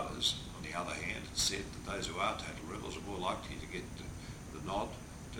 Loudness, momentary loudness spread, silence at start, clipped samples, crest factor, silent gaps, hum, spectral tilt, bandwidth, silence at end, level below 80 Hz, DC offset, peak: -38 LUFS; 13 LU; 0 s; under 0.1%; 20 dB; none; none; -3 dB/octave; over 20 kHz; 0 s; -52 dBFS; under 0.1%; -18 dBFS